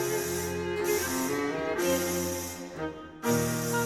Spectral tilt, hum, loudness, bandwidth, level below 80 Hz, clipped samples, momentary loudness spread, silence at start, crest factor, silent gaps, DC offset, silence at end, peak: -4 dB/octave; none; -30 LUFS; 19.5 kHz; -56 dBFS; under 0.1%; 9 LU; 0 s; 16 dB; none; under 0.1%; 0 s; -14 dBFS